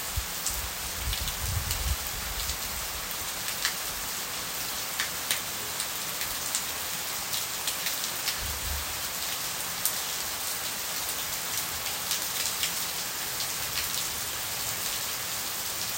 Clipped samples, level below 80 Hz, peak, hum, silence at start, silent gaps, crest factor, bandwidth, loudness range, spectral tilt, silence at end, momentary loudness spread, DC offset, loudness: under 0.1%; -44 dBFS; -2 dBFS; none; 0 s; none; 30 dB; 17 kHz; 2 LU; -0.5 dB/octave; 0 s; 3 LU; under 0.1%; -29 LUFS